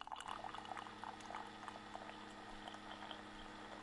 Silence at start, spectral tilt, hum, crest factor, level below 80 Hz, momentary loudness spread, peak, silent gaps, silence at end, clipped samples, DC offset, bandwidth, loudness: 0 s; -3.5 dB/octave; none; 20 dB; -70 dBFS; 4 LU; -32 dBFS; none; 0 s; under 0.1%; under 0.1%; 11.5 kHz; -51 LUFS